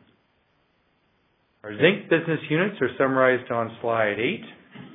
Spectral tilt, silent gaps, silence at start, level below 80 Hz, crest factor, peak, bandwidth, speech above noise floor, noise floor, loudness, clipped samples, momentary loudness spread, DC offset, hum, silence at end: -9.5 dB/octave; none; 1.65 s; -72 dBFS; 22 dB; -4 dBFS; 3.9 kHz; 44 dB; -67 dBFS; -23 LUFS; under 0.1%; 18 LU; under 0.1%; none; 0 s